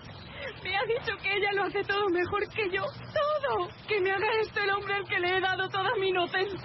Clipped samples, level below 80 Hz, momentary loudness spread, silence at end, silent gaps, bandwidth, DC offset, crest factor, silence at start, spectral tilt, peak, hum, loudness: under 0.1%; -60 dBFS; 5 LU; 0 s; none; 6 kHz; under 0.1%; 12 dB; 0 s; -6.5 dB/octave; -18 dBFS; none; -29 LUFS